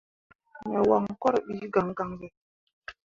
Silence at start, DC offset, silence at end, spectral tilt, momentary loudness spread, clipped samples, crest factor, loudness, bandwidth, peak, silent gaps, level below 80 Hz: 0.55 s; under 0.1%; 0.15 s; -8 dB/octave; 22 LU; under 0.1%; 20 dB; -27 LUFS; 7.4 kHz; -8 dBFS; 2.37-2.67 s, 2.73-2.82 s; -62 dBFS